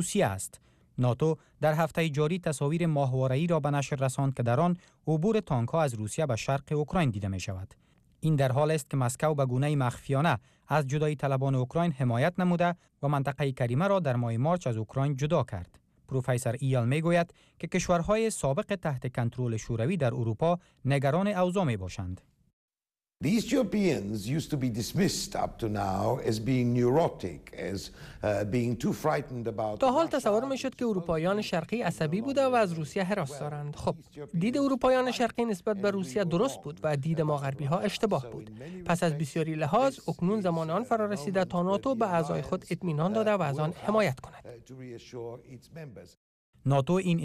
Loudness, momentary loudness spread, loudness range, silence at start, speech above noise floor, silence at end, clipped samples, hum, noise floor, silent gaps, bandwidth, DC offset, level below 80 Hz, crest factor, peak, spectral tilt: -29 LUFS; 10 LU; 2 LU; 0 s; over 61 dB; 0 s; under 0.1%; none; under -90 dBFS; 22.53-22.68 s, 46.17-46.53 s; 15 kHz; under 0.1%; -56 dBFS; 14 dB; -16 dBFS; -6.5 dB/octave